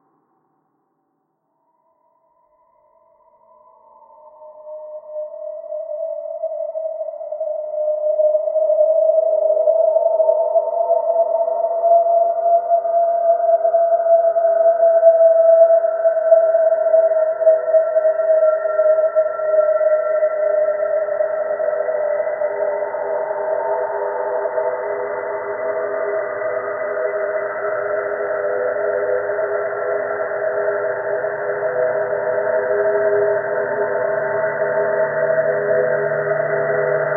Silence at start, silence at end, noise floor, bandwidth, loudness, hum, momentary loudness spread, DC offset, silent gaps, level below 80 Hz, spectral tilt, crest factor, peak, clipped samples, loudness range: 4.25 s; 0 s; -69 dBFS; 2.2 kHz; -18 LUFS; none; 10 LU; under 0.1%; none; -70 dBFS; -12 dB/octave; 16 dB; -2 dBFS; under 0.1%; 9 LU